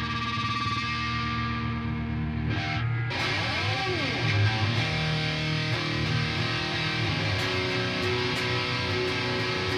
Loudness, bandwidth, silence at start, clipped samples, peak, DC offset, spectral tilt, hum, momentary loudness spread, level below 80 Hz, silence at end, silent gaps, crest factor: -27 LUFS; 12 kHz; 0 s; under 0.1%; -14 dBFS; under 0.1%; -5 dB/octave; none; 3 LU; -44 dBFS; 0 s; none; 14 dB